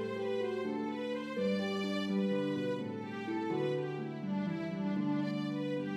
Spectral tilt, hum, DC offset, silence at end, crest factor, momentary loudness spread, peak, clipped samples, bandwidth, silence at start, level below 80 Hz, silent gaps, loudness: -7 dB/octave; none; under 0.1%; 0 s; 12 dB; 5 LU; -22 dBFS; under 0.1%; 11.5 kHz; 0 s; -84 dBFS; none; -36 LUFS